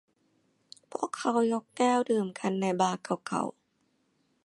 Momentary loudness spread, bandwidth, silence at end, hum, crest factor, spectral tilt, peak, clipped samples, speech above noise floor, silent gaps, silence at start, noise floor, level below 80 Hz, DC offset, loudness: 9 LU; 11.5 kHz; 0.95 s; none; 20 dB; -5 dB/octave; -12 dBFS; under 0.1%; 44 dB; none; 0.95 s; -73 dBFS; -80 dBFS; under 0.1%; -30 LUFS